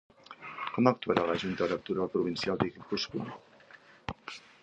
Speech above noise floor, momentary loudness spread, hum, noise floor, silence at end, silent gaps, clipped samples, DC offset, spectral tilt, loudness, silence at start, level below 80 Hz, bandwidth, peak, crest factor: 26 dB; 17 LU; none; -56 dBFS; 0.25 s; none; under 0.1%; under 0.1%; -6 dB/octave; -32 LUFS; 0.3 s; -62 dBFS; 8.4 kHz; -8 dBFS; 26 dB